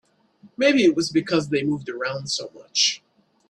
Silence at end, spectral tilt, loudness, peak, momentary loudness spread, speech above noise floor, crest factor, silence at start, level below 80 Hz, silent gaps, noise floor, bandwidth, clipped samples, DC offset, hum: 0.55 s; -3.5 dB/octave; -22 LUFS; -6 dBFS; 10 LU; 32 dB; 18 dB; 0.45 s; -64 dBFS; none; -54 dBFS; 11 kHz; under 0.1%; under 0.1%; none